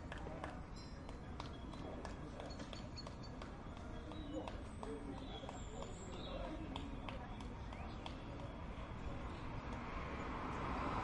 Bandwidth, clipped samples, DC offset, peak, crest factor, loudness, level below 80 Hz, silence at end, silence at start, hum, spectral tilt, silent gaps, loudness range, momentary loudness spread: 11 kHz; under 0.1%; under 0.1%; -28 dBFS; 20 dB; -49 LUFS; -52 dBFS; 0 s; 0 s; none; -6 dB/octave; none; 2 LU; 5 LU